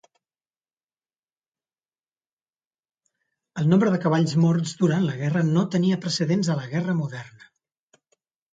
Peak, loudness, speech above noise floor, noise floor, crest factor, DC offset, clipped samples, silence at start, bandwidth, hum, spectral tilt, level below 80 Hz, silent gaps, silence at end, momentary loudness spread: -8 dBFS; -23 LUFS; over 68 dB; under -90 dBFS; 18 dB; under 0.1%; under 0.1%; 3.55 s; 9.2 kHz; none; -6.5 dB/octave; -66 dBFS; none; 1.25 s; 7 LU